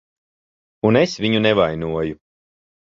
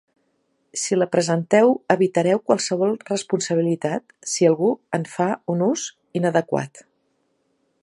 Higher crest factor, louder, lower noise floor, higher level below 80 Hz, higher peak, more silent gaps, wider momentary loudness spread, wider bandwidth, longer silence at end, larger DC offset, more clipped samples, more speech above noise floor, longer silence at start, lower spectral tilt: about the same, 20 dB vs 22 dB; about the same, -19 LUFS vs -21 LUFS; first, under -90 dBFS vs -69 dBFS; first, -48 dBFS vs -70 dBFS; about the same, -2 dBFS vs 0 dBFS; neither; about the same, 8 LU vs 10 LU; second, 7.6 kHz vs 11.5 kHz; second, 0.75 s vs 1.05 s; neither; neither; first, over 72 dB vs 48 dB; about the same, 0.85 s vs 0.75 s; about the same, -6 dB/octave vs -5 dB/octave